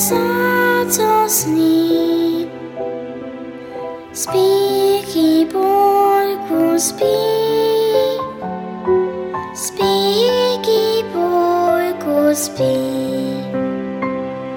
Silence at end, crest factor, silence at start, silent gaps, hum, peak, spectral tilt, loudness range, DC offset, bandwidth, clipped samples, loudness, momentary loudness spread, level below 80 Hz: 0 s; 14 dB; 0 s; none; none; -2 dBFS; -3.5 dB/octave; 4 LU; under 0.1%; 18 kHz; under 0.1%; -16 LUFS; 12 LU; -54 dBFS